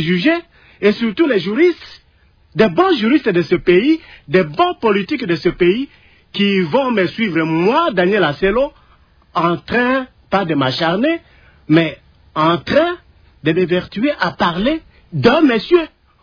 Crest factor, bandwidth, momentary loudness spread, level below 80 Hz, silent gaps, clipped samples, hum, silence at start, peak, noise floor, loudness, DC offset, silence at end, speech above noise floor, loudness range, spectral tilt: 14 dB; 5.4 kHz; 8 LU; -46 dBFS; none; under 0.1%; none; 0 s; -2 dBFS; -52 dBFS; -16 LUFS; under 0.1%; 0.35 s; 37 dB; 2 LU; -7.5 dB/octave